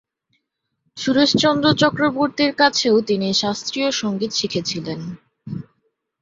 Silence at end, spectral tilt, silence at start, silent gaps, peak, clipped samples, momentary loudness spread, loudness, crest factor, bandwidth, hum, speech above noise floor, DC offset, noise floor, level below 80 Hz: 0.6 s; -4 dB/octave; 0.95 s; none; -2 dBFS; under 0.1%; 17 LU; -18 LUFS; 18 dB; 7.8 kHz; none; 56 dB; under 0.1%; -75 dBFS; -58 dBFS